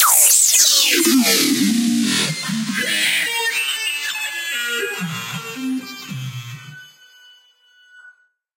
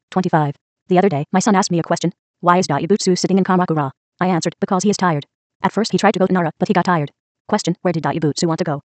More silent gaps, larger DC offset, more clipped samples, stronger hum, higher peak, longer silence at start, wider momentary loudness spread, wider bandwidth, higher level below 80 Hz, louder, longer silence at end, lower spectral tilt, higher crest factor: second, none vs 0.61-0.76 s, 0.82-0.86 s, 2.19-2.34 s, 3.97-4.12 s, 5.35-5.60 s, 7.20-7.45 s; neither; neither; neither; about the same, 0 dBFS vs 0 dBFS; about the same, 0 s vs 0.1 s; first, 19 LU vs 7 LU; first, 16 kHz vs 9 kHz; second, -72 dBFS vs -62 dBFS; about the same, -16 LUFS vs -18 LUFS; first, 0.5 s vs 0.05 s; second, -1 dB/octave vs -5.5 dB/octave; about the same, 20 dB vs 18 dB